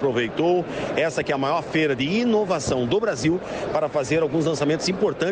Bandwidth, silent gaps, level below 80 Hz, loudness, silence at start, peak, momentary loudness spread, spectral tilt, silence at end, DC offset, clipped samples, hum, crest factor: 9.8 kHz; none; -50 dBFS; -23 LUFS; 0 s; -8 dBFS; 3 LU; -5 dB/octave; 0 s; under 0.1%; under 0.1%; none; 14 dB